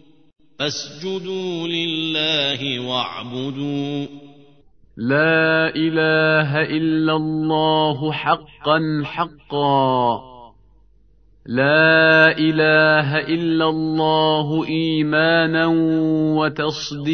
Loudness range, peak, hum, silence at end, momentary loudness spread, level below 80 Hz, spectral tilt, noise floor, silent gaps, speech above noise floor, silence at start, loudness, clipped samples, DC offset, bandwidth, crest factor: 7 LU; 0 dBFS; none; 0 s; 12 LU; -56 dBFS; -5.5 dB/octave; -54 dBFS; none; 36 dB; 0.6 s; -18 LUFS; under 0.1%; under 0.1%; 6.6 kHz; 18 dB